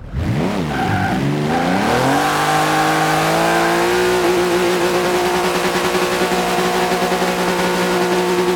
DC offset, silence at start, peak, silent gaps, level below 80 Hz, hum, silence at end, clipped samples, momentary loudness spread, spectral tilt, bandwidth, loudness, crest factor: under 0.1%; 0 s; -2 dBFS; none; -38 dBFS; none; 0 s; under 0.1%; 3 LU; -4.5 dB/octave; 18.5 kHz; -16 LUFS; 14 dB